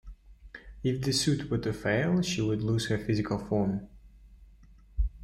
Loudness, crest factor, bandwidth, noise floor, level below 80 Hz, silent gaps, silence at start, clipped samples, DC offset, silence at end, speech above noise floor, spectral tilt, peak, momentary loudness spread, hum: -30 LUFS; 16 dB; 16 kHz; -55 dBFS; -42 dBFS; none; 0.05 s; under 0.1%; under 0.1%; 0 s; 26 dB; -5.5 dB/octave; -14 dBFS; 12 LU; none